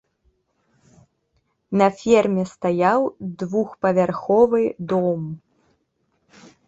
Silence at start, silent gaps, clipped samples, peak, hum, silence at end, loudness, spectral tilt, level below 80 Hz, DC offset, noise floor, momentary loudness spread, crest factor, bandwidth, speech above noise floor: 1.7 s; none; under 0.1%; -4 dBFS; none; 1.3 s; -20 LUFS; -7 dB/octave; -60 dBFS; under 0.1%; -69 dBFS; 10 LU; 18 dB; 8 kHz; 50 dB